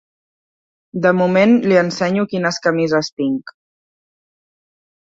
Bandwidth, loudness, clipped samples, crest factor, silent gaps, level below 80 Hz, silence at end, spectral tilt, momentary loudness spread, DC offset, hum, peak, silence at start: 7.8 kHz; -16 LUFS; under 0.1%; 16 dB; 3.12-3.17 s; -62 dBFS; 1.55 s; -6 dB/octave; 9 LU; under 0.1%; none; -2 dBFS; 0.95 s